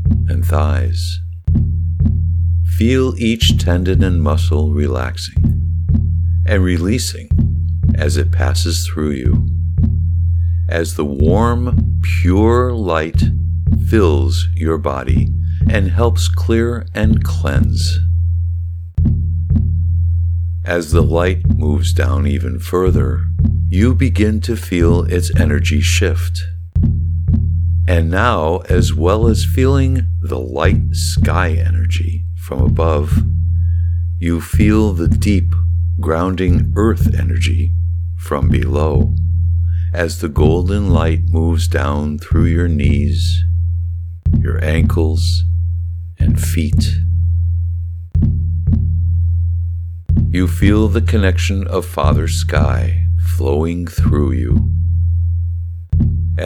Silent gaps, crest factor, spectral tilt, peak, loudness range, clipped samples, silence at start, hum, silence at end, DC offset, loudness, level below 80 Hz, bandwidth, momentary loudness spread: none; 14 dB; -6.5 dB/octave; 0 dBFS; 2 LU; under 0.1%; 0 s; none; 0 s; under 0.1%; -16 LUFS; -22 dBFS; 13.5 kHz; 5 LU